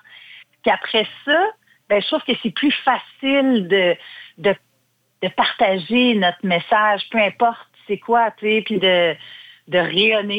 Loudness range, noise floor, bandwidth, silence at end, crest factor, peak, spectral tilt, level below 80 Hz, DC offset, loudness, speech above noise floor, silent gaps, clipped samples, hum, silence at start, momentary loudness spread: 2 LU; -65 dBFS; 16.5 kHz; 0 s; 14 dB; -4 dBFS; -6.5 dB/octave; -64 dBFS; under 0.1%; -18 LUFS; 47 dB; none; under 0.1%; none; 0.15 s; 9 LU